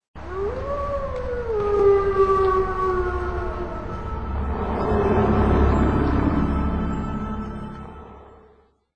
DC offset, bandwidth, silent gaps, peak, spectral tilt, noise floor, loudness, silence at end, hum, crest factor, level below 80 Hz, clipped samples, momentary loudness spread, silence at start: 0.9%; 8.4 kHz; 0.08-0.14 s; -6 dBFS; -9 dB/octave; -56 dBFS; -23 LUFS; 0 s; none; 16 dB; -30 dBFS; under 0.1%; 13 LU; 0 s